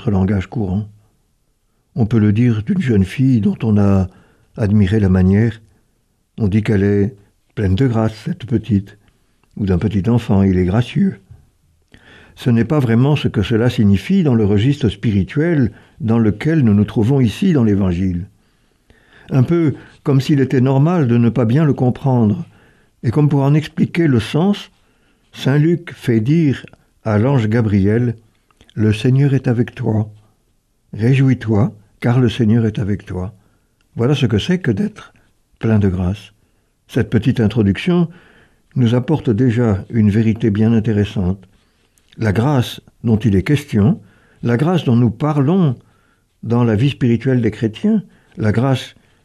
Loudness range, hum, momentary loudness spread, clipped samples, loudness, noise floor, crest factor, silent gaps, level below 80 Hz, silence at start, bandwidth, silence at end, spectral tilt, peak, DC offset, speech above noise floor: 3 LU; none; 9 LU; under 0.1%; -16 LUFS; -62 dBFS; 14 dB; none; -44 dBFS; 0 s; 13 kHz; 0.35 s; -8.5 dB/octave; -2 dBFS; under 0.1%; 47 dB